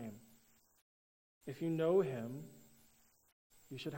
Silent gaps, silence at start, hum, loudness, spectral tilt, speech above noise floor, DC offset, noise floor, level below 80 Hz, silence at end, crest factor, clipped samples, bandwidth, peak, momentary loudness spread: 0.82-1.41 s, 3.32-3.50 s; 0 s; none; -37 LUFS; -7 dB/octave; 33 dB; under 0.1%; -70 dBFS; -80 dBFS; 0 s; 20 dB; under 0.1%; 16 kHz; -22 dBFS; 22 LU